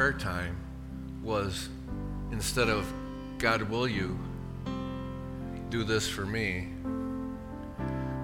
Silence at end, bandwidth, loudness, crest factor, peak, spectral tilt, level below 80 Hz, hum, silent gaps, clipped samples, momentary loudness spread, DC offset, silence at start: 0 s; 17 kHz; -33 LUFS; 22 dB; -10 dBFS; -5 dB/octave; -44 dBFS; none; none; under 0.1%; 11 LU; under 0.1%; 0 s